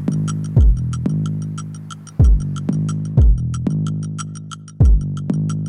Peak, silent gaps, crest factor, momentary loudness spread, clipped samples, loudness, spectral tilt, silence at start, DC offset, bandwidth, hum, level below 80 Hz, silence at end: -4 dBFS; none; 14 dB; 14 LU; under 0.1%; -19 LUFS; -8 dB/octave; 0 s; under 0.1%; 10.5 kHz; none; -20 dBFS; 0 s